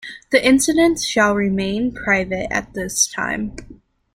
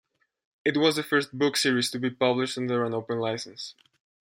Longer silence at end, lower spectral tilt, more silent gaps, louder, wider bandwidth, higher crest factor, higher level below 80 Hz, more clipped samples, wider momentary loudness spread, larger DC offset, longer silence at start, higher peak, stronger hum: second, 0.4 s vs 0.65 s; about the same, -3 dB/octave vs -4 dB/octave; neither; first, -18 LUFS vs -26 LUFS; about the same, 16.5 kHz vs 16.5 kHz; about the same, 18 dB vs 20 dB; first, -44 dBFS vs -74 dBFS; neither; about the same, 9 LU vs 10 LU; neither; second, 0 s vs 0.65 s; first, 0 dBFS vs -8 dBFS; neither